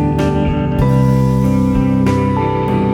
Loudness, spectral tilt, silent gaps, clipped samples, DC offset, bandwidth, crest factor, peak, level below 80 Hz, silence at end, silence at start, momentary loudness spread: -14 LUFS; -8.5 dB/octave; none; under 0.1%; under 0.1%; 13 kHz; 12 dB; -2 dBFS; -26 dBFS; 0 s; 0 s; 3 LU